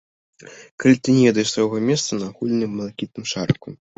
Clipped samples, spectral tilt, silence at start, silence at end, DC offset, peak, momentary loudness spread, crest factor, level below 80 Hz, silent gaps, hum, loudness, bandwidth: under 0.1%; -5 dB/octave; 0.4 s; 0.25 s; under 0.1%; -2 dBFS; 13 LU; 18 dB; -56 dBFS; 0.71-0.78 s; none; -20 LUFS; 8.2 kHz